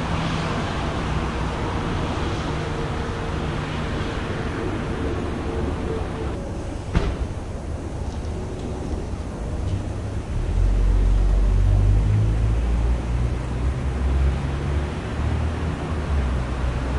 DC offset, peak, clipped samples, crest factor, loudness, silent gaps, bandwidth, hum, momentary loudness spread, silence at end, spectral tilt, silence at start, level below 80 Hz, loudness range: 0.1%; -4 dBFS; under 0.1%; 18 dB; -25 LUFS; none; 11 kHz; none; 9 LU; 0 s; -7 dB/octave; 0 s; -26 dBFS; 7 LU